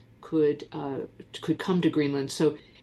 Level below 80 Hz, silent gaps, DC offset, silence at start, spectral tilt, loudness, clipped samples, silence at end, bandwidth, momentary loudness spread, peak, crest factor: -66 dBFS; none; under 0.1%; 0.2 s; -6.5 dB/octave; -28 LUFS; under 0.1%; 0.25 s; 12.5 kHz; 11 LU; -12 dBFS; 16 dB